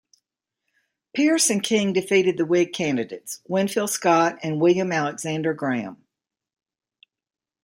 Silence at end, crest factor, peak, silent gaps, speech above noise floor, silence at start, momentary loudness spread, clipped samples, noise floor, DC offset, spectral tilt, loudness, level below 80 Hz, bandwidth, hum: 1.7 s; 18 dB; -6 dBFS; none; 59 dB; 1.15 s; 9 LU; under 0.1%; -81 dBFS; under 0.1%; -4 dB/octave; -22 LUFS; -70 dBFS; 16.5 kHz; none